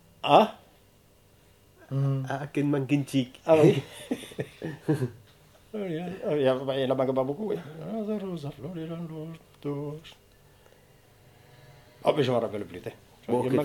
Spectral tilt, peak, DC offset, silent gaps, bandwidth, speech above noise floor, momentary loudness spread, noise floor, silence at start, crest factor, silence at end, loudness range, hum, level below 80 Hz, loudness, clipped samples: -7 dB/octave; -4 dBFS; under 0.1%; none; 18 kHz; 32 dB; 17 LU; -59 dBFS; 0.25 s; 24 dB; 0 s; 10 LU; none; -64 dBFS; -28 LUFS; under 0.1%